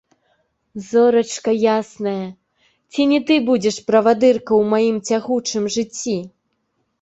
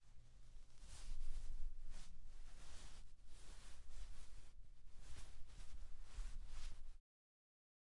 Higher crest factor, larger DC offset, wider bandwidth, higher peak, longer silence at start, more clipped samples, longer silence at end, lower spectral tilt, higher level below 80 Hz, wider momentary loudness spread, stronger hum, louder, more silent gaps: about the same, 16 dB vs 14 dB; neither; second, 8.2 kHz vs 11 kHz; first, -2 dBFS vs -30 dBFS; first, 0.75 s vs 0 s; neither; second, 0.75 s vs 1 s; about the same, -4.5 dB/octave vs -3.5 dB/octave; second, -60 dBFS vs -52 dBFS; about the same, 11 LU vs 12 LU; neither; first, -18 LUFS vs -61 LUFS; neither